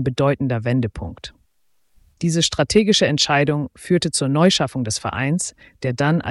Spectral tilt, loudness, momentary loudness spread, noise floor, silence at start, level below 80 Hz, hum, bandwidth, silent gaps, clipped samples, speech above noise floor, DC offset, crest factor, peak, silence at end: -4.5 dB/octave; -19 LUFS; 12 LU; -69 dBFS; 0 s; -46 dBFS; none; 12 kHz; none; under 0.1%; 49 dB; under 0.1%; 16 dB; -4 dBFS; 0 s